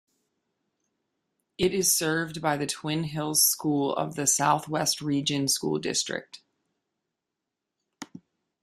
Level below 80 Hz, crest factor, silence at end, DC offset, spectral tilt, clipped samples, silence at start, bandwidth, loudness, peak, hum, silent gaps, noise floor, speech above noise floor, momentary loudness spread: -64 dBFS; 20 dB; 0.45 s; under 0.1%; -3 dB/octave; under 0.1%; 1.6 s; 15.5 kHz; -25 LUFS; -8 dBFS; none; none; -86 dBFS; 59 dB; 10 LU